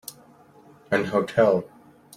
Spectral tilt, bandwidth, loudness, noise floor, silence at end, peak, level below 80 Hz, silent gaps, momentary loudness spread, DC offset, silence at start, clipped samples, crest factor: -6 dB/octave; 16 kHz; -23 LUFS; -52 dBFS; 0.5 s; -6 dBFS; -64 dBFS; none; 19 LU; under 0.1%; 0.1 s; under 0.1%; 20 dB